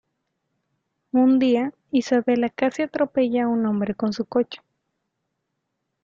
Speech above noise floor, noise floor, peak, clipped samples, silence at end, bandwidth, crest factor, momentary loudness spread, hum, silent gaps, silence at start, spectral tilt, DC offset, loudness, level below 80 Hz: 57 dB; -78 dBFS; -6 dBFS; under 0.1%; 1.45 s; 7.4 kHz; 16 dB; 7 LU; none; none; 1.15 s; -6.5 dB/octave; under 0.1%; -22 LUFS; -66 dBFS